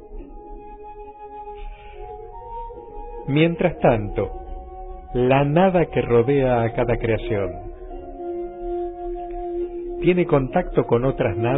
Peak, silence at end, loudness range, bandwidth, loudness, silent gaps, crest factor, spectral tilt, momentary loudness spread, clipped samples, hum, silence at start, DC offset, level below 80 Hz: -4 dBFS; 0 s; 7 LU; 4 kHz; -21 LUFS; none; 18 dB; -12 dB/octave; 21 LU; under 0.1%; none; 0 s; 0.2%; -38 dBFS